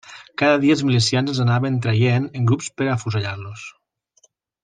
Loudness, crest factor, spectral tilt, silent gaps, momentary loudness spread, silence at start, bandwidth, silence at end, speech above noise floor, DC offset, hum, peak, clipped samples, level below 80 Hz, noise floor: -19 LUFS; 18 dB; -6 dB/octave; none; 16 LU; 0.1 s; 9.6 kHz; 0.95 s; 42 dB; under 0.1%; none; -2 dBFS; under 0.1%; -60 dBFS; -61 dBFS